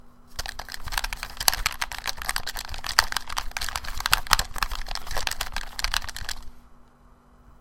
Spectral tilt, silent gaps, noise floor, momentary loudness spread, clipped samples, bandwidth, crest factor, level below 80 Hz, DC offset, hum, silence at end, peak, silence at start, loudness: 0 dB/octave; none; -54 dBFS; 12 LU; under 0.1%; 17 kHz; 28 dB; -36 dBFS; under 0.1%; none; 0.05 s; 0 dBFS; 0.05 s; -27 LUFS